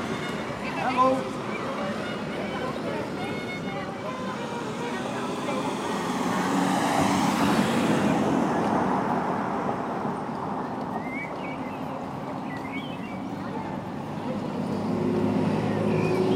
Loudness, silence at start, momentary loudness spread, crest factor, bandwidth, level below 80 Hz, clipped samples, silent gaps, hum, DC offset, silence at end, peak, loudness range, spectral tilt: -28 LUFS; 0 s; 10 LU; 16 dB; 16 kHz; -58 dBFS; under 0.1%; none; none; under 0.1%; 0 s; -10 dBFS; 8 LU; -5.5 dB/octave